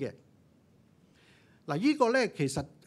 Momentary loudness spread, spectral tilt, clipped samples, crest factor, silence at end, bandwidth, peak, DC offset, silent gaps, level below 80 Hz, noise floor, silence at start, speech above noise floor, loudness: 14 LU; -5.5 dB/octave; under 0.1%; 22 dB; 0.2 s; 13 kHz; -10 dBFS; under 0.1%; none; -64 dBFS; -63 dBFS; 0 s; 34 dB; -29 LUFS